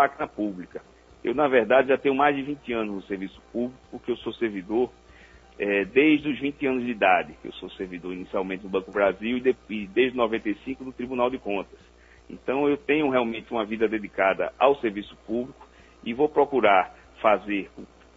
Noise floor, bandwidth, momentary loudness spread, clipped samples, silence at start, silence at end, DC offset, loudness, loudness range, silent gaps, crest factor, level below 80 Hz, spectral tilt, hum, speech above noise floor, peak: -51 dBFS; 7.6 kHz; 15 LU; under 0.1%; 0 s; 0.3 s; under 0.1%; -25 LUFS; 3 LU; none; 22 dB; -56 dBFS; -7 dB/octave; none; 26 dB; -4 dBFS